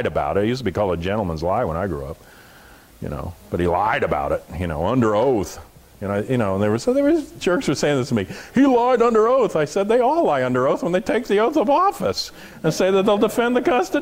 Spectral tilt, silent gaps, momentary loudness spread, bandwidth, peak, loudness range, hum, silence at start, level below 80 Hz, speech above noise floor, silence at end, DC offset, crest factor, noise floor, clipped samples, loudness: -6 dB/octave; none; 11 LU; 16 kHz; -6 dBFS; 6 LU; none; 0 s; -44 dBFS; 27 dB; 0 s; under 0.1%; 14 dB; -46 dBFS; under 0.1%; -20 LUFS